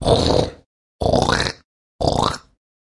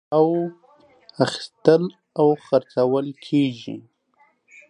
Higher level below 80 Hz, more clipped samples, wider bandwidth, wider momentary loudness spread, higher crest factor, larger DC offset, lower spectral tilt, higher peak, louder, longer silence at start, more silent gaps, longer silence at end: first, -34 dBFS vs -72 dBFS; neither; about the same, 11.5 kHz vs 10.5 kHz; about the same, 12 LU vs 12 LU; about the same, 20 dB vs 22 dB; neither; second, -5 dB/octave vs -7 dB/octave; about the same, 0 dBFS vs 0 dBFS; about the same, -20 LUFS vs -21 LUFS; about the same, 0 s vs 0.1 s; first, 0.66-0.99 s, 1.65-1.99 s vs none; second, 0.6 s vs 0.9 s